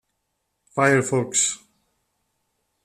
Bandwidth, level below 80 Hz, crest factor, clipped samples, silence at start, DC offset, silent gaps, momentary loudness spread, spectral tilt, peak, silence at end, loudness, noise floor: 13.5 kHz; -66 dBFS; 22 dB; under 0.1%; 0.75 s; under 0.1%; none; 12 LU; -3.5 dB/octave; -4 dBFS; 1.3 s; -21 LUFS; -76 dBFS